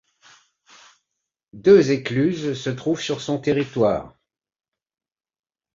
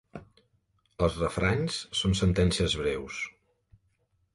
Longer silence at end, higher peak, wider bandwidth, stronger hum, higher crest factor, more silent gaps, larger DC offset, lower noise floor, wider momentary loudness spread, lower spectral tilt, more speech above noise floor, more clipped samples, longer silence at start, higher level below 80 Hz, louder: first, 1.65 s vs 1.05 s; first, -2 dBFS vs -12 dBFS; second, 7.6 kHz vs 11.5 kHz; neither; about the same, 20 dB vs 18 dB; neither; neither; first, -80 dBFS vs -72 dBFS; about the same, 11 LU vs 12 LU; about the same, -6 dB/octave vs -5 dB/octave; first, 60 dB vs 45 dB; neither; first, 1.55 s vs 0.15 s; second, -56 dBFS vs -42 dBFS; first, -20 LUFS vs -28 LUFS